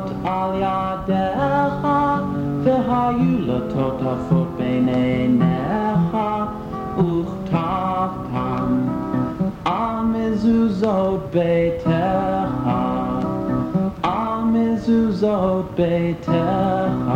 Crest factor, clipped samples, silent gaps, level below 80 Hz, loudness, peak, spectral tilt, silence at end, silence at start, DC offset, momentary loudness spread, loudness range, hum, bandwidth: 14 dB; under 0.1%; none; -42 dBFS; -20 LUFS; -6 dBFS; -9 dB/octave; 0 s; 0 s; under 0.1%; 5 LU; 2 LU; none; 8.6 kHz